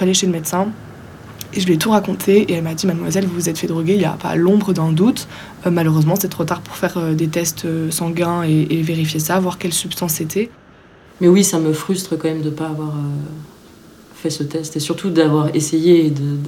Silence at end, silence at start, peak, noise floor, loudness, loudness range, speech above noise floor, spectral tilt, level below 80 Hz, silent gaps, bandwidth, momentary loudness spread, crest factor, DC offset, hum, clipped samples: 0 s; 0 s; -2 dBFS; -45 dBFS; -17 LUFS; 4 LU; 28 dB; -5.5 dB/octave; -52 dBFS; none; 17 kHz; 10 LU; 16 dB; under 0.1%; none; under 0.1%